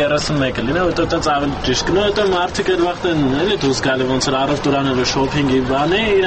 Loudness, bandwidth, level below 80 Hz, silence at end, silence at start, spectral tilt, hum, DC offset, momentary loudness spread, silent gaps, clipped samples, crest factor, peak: -17 LUFS; 8.8 kHz; -34 dBFS; 0 s; 0 s; -4.5 dB/octave; none; under 0.1%; 2 LU; none; under 0.1%; 12 dB; -6 dBFS